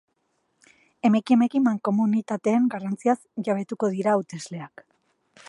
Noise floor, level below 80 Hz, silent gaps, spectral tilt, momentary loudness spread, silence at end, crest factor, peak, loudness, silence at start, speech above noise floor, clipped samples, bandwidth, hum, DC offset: -72 dBFS; -76 dBFS; none; -7 dB/octave; 15 LU; 0.8 s; 18 dB; -8 dBFS; -24 LUFS; 1.05 s; 49 dB; under 0.1%; 11 kHz; none; under 0.1%